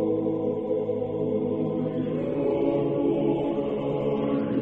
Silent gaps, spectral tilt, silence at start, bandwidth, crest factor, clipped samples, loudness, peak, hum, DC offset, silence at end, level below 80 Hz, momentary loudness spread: none; -10.5 dB/octave; 0 s; 4 kHz; 14 dB; under 0.1%; -26 LUFS; -12 dBFS; none; under 0.1%; 0 s; -54 dBFS; 3 LU